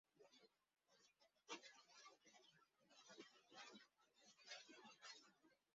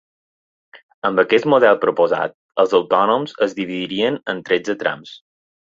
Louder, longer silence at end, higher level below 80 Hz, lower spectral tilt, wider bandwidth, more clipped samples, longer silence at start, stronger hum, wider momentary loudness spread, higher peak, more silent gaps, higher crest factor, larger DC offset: second, -63 LUFS vs -18 LUFS; second, 0.05 s vs 0.5 s; second, under -90 dBFS vs -64 dBFS; second, 0.5 dB/octave vs -5.5 dB/octave; about the same, 7.4 kHz vs 7.6 kHz; neither; second, 0.15 s vs 0.75 s; neither; about the same, 9 LU vs 10 LU; second, -42 dBFS vs -2 dBFS; second, none vs 0.83-1.02 s, 2.34-2.49 s; first, 26 dB vs 18 dB; neither